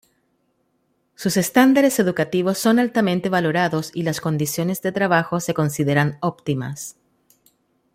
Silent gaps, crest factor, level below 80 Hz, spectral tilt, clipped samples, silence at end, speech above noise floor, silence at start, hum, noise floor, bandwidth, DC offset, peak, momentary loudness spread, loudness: none; 18 dB; -60 dBFS; -5.5 dB/octave; under 0.1%; 1.05 s; 48 dB; 1.2 s; none; -68 dBFS; 16.5 kHz; under 0.1%; -2 dBFS; 10 LU; -20 LUFS